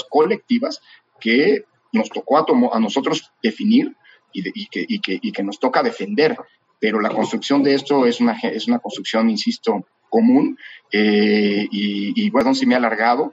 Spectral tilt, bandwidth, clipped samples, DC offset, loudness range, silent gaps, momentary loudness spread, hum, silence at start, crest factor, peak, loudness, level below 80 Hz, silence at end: -5.5 dB/octave; 8 kHz; under 0.1%; under 0.1%; 3 LU; none; 10 LU; none; 0.1 s; 16 dB; -2 dBFS; -19 LUFS; -68 dBFS; 0 s